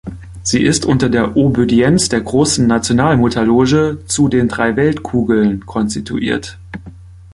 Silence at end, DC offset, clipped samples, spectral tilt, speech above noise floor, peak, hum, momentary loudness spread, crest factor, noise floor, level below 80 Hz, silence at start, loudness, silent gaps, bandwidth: 0.05 s; under 0.1%; under 0.1%; -5 dB/octave; 22 dB; 0 dBFS; none; 8 LU; 14 dB; -35 dBFS; -36 dBFS; 0.05 s; -14 LUFS; none; 11.5 kHz